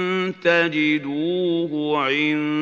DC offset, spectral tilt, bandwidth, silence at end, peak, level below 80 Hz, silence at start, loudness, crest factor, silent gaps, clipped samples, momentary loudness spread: under 0.1%; -6 dB/octave; 7.2 kHz; 0 s; -4 dBFS; -76 dBFS; 0 s; -21 LUFS; 18 dB; none; under 0.1%; 5 LU